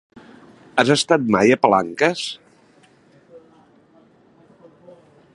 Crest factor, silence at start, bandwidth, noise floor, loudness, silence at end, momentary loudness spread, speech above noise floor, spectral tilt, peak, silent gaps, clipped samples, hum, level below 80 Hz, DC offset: 22 dB; 0.75 s; 11.5 kHz; -54 dBFS; -18 LUFS; 1.95 s; 13 LU; 37 dB; -4.5 dB/octave; 0 dBFS; none; under 0.1%; none; -62 dBFS; under 0.1%